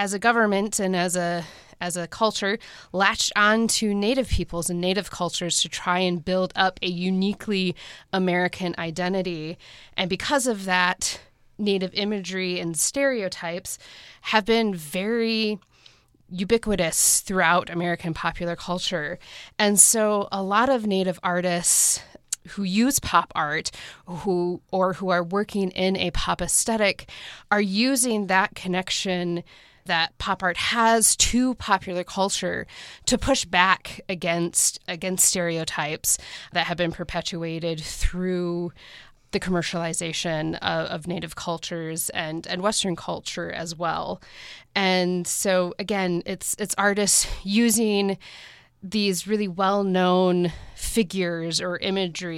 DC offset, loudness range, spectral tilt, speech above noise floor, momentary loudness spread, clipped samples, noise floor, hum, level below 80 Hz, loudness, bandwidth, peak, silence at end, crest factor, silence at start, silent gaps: under 0.1%; 6 LU; -3 dB/octave; 31 dB; 12 LU; under 0.1%; -55 dBFS; none; -44 dBFS; -23 LUFS; 16.5 kHz; 0 dBFS; 0 s; 24 dB; 0 s; none